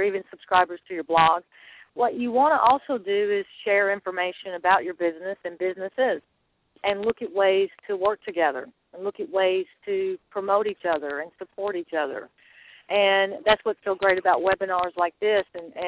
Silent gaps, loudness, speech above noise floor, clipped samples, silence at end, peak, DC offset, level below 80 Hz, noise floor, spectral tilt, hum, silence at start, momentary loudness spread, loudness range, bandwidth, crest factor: none; -24 LUFS; 28 dB; under 0.1%; 0 s; -6 dBFS; under 0.1%; -62 dBFS; -52 dBFS; -7.5 dB/octave; none; 0 s; 12 LU; 4 LU; 4 kHz; 18 dB